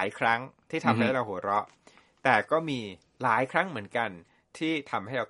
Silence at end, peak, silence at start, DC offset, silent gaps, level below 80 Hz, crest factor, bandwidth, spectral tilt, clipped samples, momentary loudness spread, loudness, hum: 0.05 s; -6 dBFS; 0 s; under 0.1%; none; -72 dBFS; 24 dB; 11.5 kHz; -6 dB/octave; under 0.1%; 10 LU; -28 LUFS; none